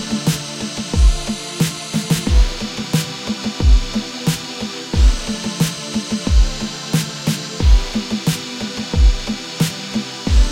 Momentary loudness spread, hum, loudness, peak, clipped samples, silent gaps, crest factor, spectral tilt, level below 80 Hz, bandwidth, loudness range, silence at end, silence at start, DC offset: 8 LU; none; -19 LUFS; -2 dBFS; under 0.1%; none; 16 dB; -4.5 dB/octave; -18 dBFS; 16 kHz; 1 LU; 0 s; 0 s; under 0.1%